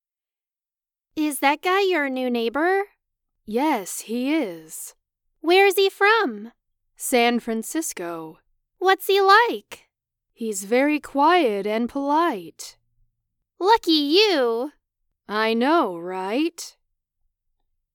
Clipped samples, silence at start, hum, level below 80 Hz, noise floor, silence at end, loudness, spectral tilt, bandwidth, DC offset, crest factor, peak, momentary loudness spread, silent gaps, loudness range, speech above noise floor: under 0.1%; 1.15 s; none; -66 dBFS; under -90 dBFS; 1.25 s; -21 LUFS; -2.5 dB/octave; 19 kHz; under 0.1%; 20 dB; -2 dBFS; 18 LU; none; 4 LU; over 69 dB